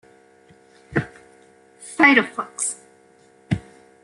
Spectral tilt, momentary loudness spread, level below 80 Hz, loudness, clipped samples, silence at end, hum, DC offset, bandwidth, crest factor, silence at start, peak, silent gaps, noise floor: -4 dB/octave; 23 LU; -54 dBFS; -20 LUFS; under 0.1%; 0.45 s; none; under 0.1%; 11.5 kHz; 24 dB; 0.9 s; 0 dBFS; none; -54 dBFS